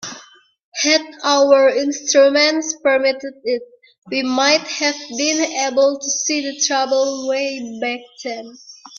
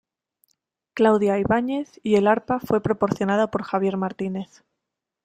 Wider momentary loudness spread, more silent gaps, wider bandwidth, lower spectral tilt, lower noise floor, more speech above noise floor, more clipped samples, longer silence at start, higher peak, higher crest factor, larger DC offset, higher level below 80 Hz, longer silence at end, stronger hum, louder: first, 15 LU vs 11 LU; first, 0.63-0.72 s, 3.98-4.02 s vs none; second, 7.2 kHz vs 15 kHz; second, -0.5 dB/octave vs -7 dB/octave; second, -45 dBFS vs -83 dBFS; second, 28 dB vs 62 dB; neither; second, 0 s vs 0.95 s; first, 0 dBFS vs -4 dBFS; about the same, 18 dB vs 18 dB; neither; second, -68 dBFS vs -56 dBFS; second, 0 s vs 0.8 s; neither; first, -17 LUFS vs -22 LUFS